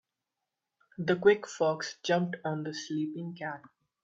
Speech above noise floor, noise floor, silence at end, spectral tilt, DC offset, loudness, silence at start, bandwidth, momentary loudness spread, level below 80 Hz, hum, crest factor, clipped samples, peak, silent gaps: 57 dB; -87 dBFS; 0.35 s; -5.5 dB/octave; under 0.1%; -31 LUFS; 1 s; 7.8 kHz; 14 LU; -76 dBFS; none; 22 dB; under 0.1%; -10 dBFS; none